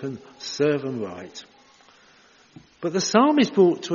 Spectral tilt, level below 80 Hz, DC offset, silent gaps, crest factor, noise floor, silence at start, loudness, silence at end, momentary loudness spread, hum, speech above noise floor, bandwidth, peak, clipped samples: -4.5 dB/octave; -70 dBFS; under 0.1%; none; 22 dB; -55 dBFS; 0 s; -22 LUFS; 0 s; 19 LU; none; 33 dB; 7.2 kHz; -2 dBFS; under 0.1%